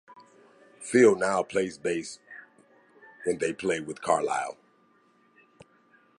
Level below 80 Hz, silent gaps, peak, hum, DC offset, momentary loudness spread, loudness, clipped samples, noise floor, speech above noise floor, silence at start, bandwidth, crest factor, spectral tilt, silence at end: -68 dBFS; none; -8 dBFS; none; under 0.1%; 22 LU; -27 LUFS; under 0.1%; -64 dBFS; 38 dB; 0.1 s; 11.5 kHz; 22 dB; -4.5 dB/octave; 1.65 s